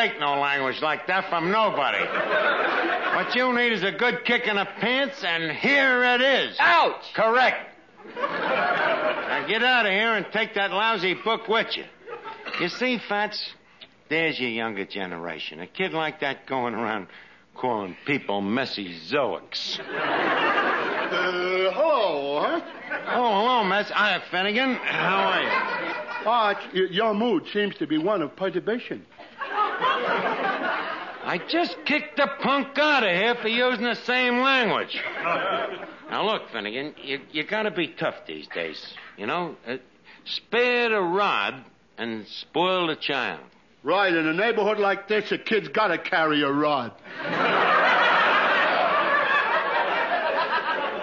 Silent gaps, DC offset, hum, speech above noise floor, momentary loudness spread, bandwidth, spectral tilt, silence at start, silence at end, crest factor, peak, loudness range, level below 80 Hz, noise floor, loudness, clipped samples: none; under 0.1%; none; 27 dB; 12 LU; 7.4 kHz; -5 dB/octave; 0 s; 0 s; 16 dB; -10 dBFS; 7 LU; -74 dBFS; -51 dBFS; -23 LUFS; under 0.1%